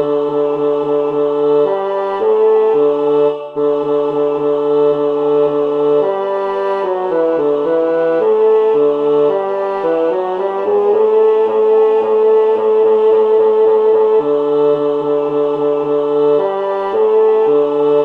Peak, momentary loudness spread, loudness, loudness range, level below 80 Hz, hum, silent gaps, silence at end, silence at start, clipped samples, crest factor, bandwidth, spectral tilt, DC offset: -4 dBFS; 6 LU; -13 LUFS; 3 LU; -60 dBFS; none; none; 0 s; 0 s; under 0.1%; 10 dB; 4.3 kHz; -7.5 dB/octave; under 0.1%